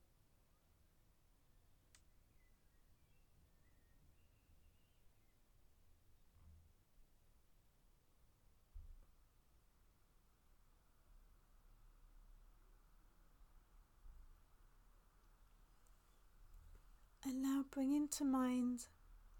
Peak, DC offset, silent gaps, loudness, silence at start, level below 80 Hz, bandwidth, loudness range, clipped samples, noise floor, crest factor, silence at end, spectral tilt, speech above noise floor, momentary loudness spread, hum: -28 dBFS; under 0.1%; none; -42 LUFS; 6.5 s; -68 dBFS; 19 kHz; 10 LU; under 0.1%; -74 dBFS; 24 dB; 0 s; -4 dB/octave; 33 dB; 11 LU; none